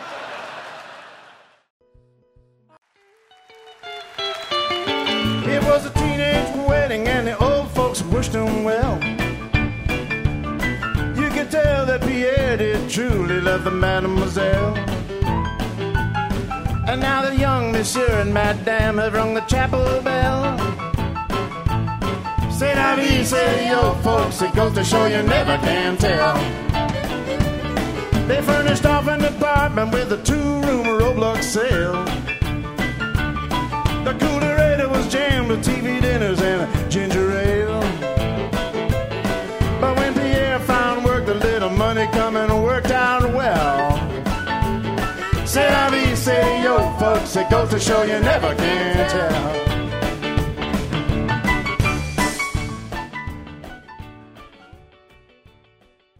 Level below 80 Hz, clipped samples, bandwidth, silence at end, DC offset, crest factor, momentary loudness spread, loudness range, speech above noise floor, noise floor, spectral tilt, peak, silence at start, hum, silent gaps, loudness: -30 dBFS; under 0.1%; 16 kHz; 1.45 s; under 0.1%; 18 dB; 7 LU; 4 LU; 41 dB; -58 dBFS; -5.5 dB/octave; -2 dBFS; 0 s; none; 1.70-1.80 s, 2.78-2.82 s; -20 LUFS